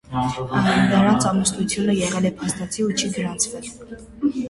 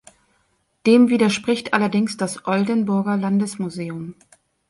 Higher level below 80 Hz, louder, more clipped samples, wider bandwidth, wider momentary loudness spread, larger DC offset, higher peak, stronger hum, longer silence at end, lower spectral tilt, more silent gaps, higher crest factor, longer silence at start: first, -48 dBFS vs -64 dBFS; about the same, -21 LUFS vs -20 LUFS; neither; about the same, 11.5 kHz vs 11.5 kHz; second, 10 LU vs 14 LU; neither; about the same, -4 dBFS vs -2 dBFS; neither; second, 0 s vs 0.6 s; about the same, -4.5 dB/octave vs -5.5 dB/octave; neither; about the same, 16 dB vs 18 dB; second, 0.1 s vs 0.85 s